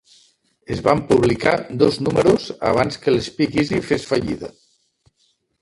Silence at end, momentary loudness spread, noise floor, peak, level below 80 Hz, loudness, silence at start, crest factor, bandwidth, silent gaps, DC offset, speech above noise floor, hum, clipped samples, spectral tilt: 1.1 s; 6 LU; -65 dBFS; 0 dBFS; -46 dBFS; -19 LUFS; 0.7 s; 20 dB; 11.5 kHz; none; under 0.1%; 47 dB; none; under 0.1%; -6 dB/octave